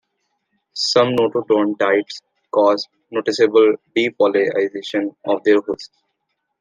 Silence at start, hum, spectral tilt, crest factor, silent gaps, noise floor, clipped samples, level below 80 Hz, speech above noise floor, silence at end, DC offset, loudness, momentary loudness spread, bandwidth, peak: 0.75 s; none; -4.5 dB/octave; 16 dB; none; -74 dBFS; under 0.1%; -68 dBFS; 57 dB; 0.75 s; under 0.1%; -18 LUFS; 10 LU; 9.6 kHz; -2 dBFS